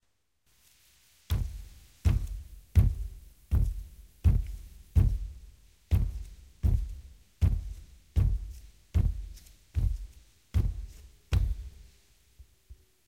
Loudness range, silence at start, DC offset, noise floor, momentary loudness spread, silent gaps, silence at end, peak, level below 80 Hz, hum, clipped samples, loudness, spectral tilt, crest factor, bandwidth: 4 LU; 1.3 s; under 0.1%; -75 dBFS; 21 LU; none; 0.35 s; -10 dBFS; -34 dBFS; none; under 0.1%; -32 LUFS; -7.5 dB/octave; 20 dB; 16 kHz